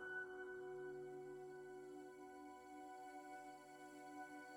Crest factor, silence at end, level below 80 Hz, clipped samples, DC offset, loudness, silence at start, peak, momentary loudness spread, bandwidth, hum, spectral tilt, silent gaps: 14 dB; 0 s; -86 dBFS; under 0.1%; under 0.1%; -55 LUFS; 0 s; -40 dBFS; 6 LU; 17 kHz; none; -4.5 dB/octave; none